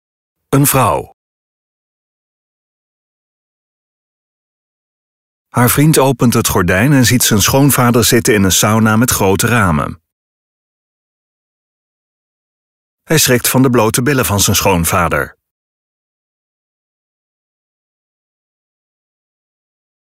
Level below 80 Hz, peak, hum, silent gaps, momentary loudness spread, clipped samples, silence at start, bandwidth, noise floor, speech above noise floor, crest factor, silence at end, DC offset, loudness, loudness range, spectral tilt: -38 dBFS; 0 dBFS; none; 1.13-5.45 s, 10.12-12.98 s; 6 LU; under 0.1%; 0.5 s; 16.5 kHz; under -90 dBFS; over 79 dB; 14 dB; 4.8 s; under 0.1%; -11 LUFS; 11 LU; -4 dB/octave